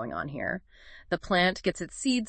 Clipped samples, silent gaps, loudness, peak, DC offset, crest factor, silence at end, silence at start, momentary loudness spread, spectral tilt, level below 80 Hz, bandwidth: under 0.1%; none; -29 LUFS; -10 dBFS; under 0.1%; 20 dB; 0 s; 0 s; 10 LU; -4 dB/octave; -54 dBFS; 8.8 kHz